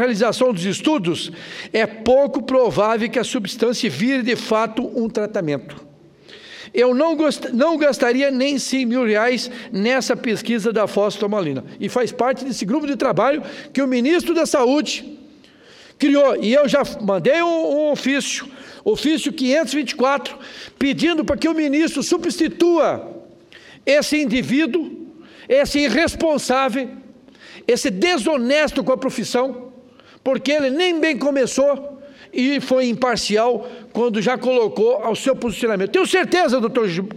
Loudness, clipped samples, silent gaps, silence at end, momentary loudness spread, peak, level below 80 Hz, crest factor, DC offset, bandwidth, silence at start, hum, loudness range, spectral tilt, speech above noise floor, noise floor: -19 LUFS; under 0.1%; none; 0 s; 9 LU; -4 dBFS; -52 dBFS; 16 dB; under 0.1%; 15.5 kHz; 0 s; none; 2 LU; -4.5 dB/octave; 28 dB; -47 dBFS